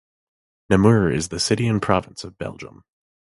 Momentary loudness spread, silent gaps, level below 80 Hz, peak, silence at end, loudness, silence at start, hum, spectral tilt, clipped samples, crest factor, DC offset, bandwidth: 19 LU; none; -44 dBFS; 0 dBFS; 0.7 s; -19 LUFS; 0.7 s; none; -5.5 dB/octave; under 0.1%; 22 dB; under 0.1%; 11.5 kHz